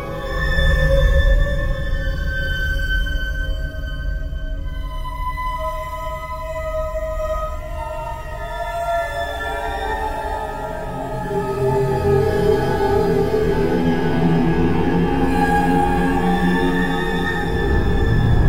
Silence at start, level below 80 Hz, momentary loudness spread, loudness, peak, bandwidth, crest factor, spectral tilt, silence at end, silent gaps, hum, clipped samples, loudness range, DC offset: 0 s; -24 dBFS; 10 LU; -21 LUFS; -4 dBFS; 16 kHz; 14 dB; -7 dB/octave; 0 s; none; none; under 0.1%; 8 LU; 1%